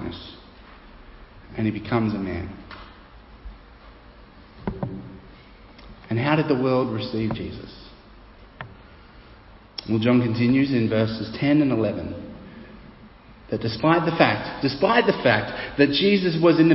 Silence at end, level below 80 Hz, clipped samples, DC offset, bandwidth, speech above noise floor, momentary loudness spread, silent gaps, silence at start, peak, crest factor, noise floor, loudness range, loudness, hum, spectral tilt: 0 s; -48 dBFS; under 0.1%; under 0.1%; 5.8 kHz; 27 dB; 22 LU; none; 0 s; -2 dBFS; 22 dB; -48 dBFS; 12 LU; -22 LUFS; none; -10.5 dB/octave